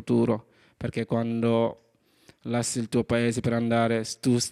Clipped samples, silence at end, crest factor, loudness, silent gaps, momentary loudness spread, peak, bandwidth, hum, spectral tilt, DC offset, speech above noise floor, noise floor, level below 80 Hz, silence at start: under 0.1%; 0 s; 16 dB; -26 LUFS; none; 8 LU; -10 dBFS; 14 kHz; none; -5.5 dB/octave; under 0.1%; 34 dB; -59 dBFS; -58 dBFS; 0 s